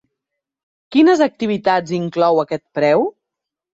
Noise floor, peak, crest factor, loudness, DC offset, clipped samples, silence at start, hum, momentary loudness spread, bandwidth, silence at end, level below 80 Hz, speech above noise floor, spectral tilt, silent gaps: -83 dBFS; -2 dBFS; 16 dB; -17 LUFS; under 0.1%; under 0.1%; 0.9 s; none; 8 LU; 7.8 kHz; 0.7 s; -62 dBFS; 67 dB; -6.5 dB/octave; none